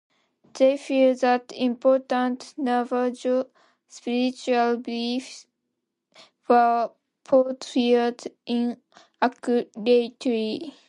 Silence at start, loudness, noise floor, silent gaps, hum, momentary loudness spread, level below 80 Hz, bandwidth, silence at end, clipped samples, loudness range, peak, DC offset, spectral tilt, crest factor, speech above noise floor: 0.55 s; -24 LUFS; -80 dBFS; none; none; 10 LU; -76 dBFS; 10.5 kHz; 0.2 s; under 0.1%; 3 LU; -6 dBFS; under 0.1%; -4.5 dB/octave; 18 dB; 57 dB